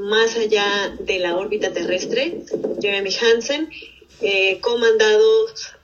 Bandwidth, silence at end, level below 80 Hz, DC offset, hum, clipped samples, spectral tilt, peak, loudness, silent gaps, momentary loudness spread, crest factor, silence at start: 7.2 kHz; 0.15 s; -56 dBFS; under 0.1%; none; under 0.1%; -2.5 dB/octave; -4 dBFS; -19 LUFS; none; 11 LU; 16 dB; 0 s